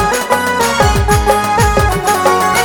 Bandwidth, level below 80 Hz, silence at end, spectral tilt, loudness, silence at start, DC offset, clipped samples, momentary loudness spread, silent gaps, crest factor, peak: 19.5 kHz; -22 dBFS; 0 s; -4 dB/octave; -12 LUFS; 0 s; under 0.1%; under 0.1%; 2 LU; none; 12 dB; 0 dBFS